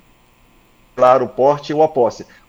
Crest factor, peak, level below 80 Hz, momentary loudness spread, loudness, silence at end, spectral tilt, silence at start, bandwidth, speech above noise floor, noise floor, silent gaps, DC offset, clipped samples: 16 dB; 0 dBFS; -56 dBFS; 6 LU; -15 LUFS; 0.25 s; -6.5 dB/octave; 0.95 s; 7.6 kHz; 36 dB; -52 dBFS; none; under 0.1%; under 0.1%